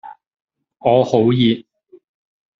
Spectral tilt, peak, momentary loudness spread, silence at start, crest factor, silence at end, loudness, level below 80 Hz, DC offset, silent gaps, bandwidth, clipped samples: -7.5 dB/octave; -2 dBFS; 8 LU; 0.05 s; 18 dB; 1 s; -16 LUFS; -58 dBFS; under 0.1%; 0.27-0.31 s; 7.4 kHz; under 0.1%